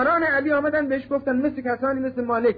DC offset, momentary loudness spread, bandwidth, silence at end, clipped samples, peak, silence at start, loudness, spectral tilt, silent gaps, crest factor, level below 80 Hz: under 0.1%; 5 LU; 5 kHz; 0 s; under 0.1%; -12 dBFS; 0 s; -23 LUFS; -9 dB/octave; none; 10 dB; -56 dBFS